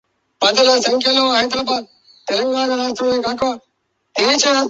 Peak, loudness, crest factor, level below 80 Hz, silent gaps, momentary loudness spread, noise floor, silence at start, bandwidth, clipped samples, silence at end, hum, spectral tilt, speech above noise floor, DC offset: 0 dBFS; -16 LUFS; 16 dB; -58 dBFS; none; 9 LU; -68 dBFS; 0.4 s; 8 kHz; under 0.1%; 0 s; none; -1.5 dB/octave; 52 dB; under 0.1%